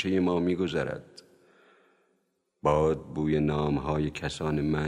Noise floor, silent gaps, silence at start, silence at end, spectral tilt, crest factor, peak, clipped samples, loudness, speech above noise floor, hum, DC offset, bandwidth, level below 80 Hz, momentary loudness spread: -75 dBFS; none; 0 s; 0 s; -7 dB/octave; 18 dB; -10 dBFS; under 0.1%; -28 LUFS; 48 dB; none; under 0.1%; 11 kHz; -46 dBFS; 6 LU